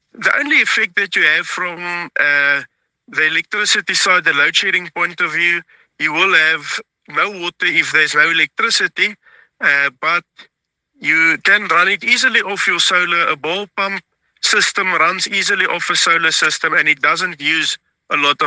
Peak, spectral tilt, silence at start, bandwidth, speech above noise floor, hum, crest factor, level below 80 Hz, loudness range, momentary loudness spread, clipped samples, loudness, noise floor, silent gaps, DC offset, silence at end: 0 dBFS; -1 dB/octave; 0.2 s; 10 kHz; 47 dB; none; 16 dB; -72 dBFS; 2 LU; 8 LU; under 0.1%; -14 LUFS; -63 dBFS; none; under 0.1%; 0 s